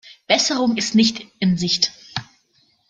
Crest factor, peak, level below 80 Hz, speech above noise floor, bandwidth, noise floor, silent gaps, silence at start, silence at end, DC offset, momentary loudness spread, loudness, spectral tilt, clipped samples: 20 dB; -2 dBFS; -58 dBFS; 43 dB; 9.4 kHz; -62 dBFS; none; 0.05 s; 0.65 s; under 0.1%; 13 LU; -18 LUFS; -3.5 dB/octave; under 0.1%